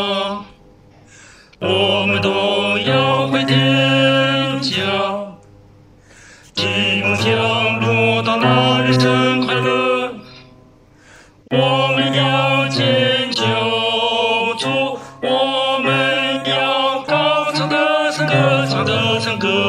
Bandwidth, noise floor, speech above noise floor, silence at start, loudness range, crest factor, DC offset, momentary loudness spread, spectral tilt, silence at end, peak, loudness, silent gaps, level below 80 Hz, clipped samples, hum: 12.5 kHz; -47 dBFS; 30 dB; 0 s; 3 LU; 16 dB; under 0.1%; 6 LU; -5 dB/octave; 0 s; -2 dBFS; -16 LUFS; none; -56 dBFS; under 0.1%; none